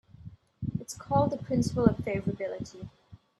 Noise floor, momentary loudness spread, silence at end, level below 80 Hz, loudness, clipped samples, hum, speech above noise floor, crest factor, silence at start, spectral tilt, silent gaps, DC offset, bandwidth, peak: -50 dBFS; 21 LU; 0.25 s; -52 dBFS; -30 LUFS; under 0.1%; none; 21 dB; 24 dB; 0.25 s; -7 dB/octave; none; under 0.1%; 13 kHz; -6 dBFS